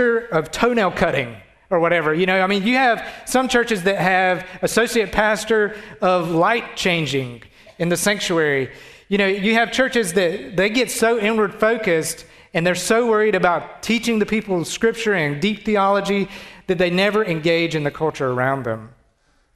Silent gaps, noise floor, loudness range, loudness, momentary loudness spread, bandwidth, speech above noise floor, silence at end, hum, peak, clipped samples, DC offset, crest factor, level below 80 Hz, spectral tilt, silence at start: none; -61 dBFS; 2 LU; -19 LUFS; 7 LU; 14 kHz; 42 dB; 0.65 s; none; -2 dBFS; under 0.1%; under 0.1%; 18 dB; -50 dBFS; -4.5 dB/octave; 0 s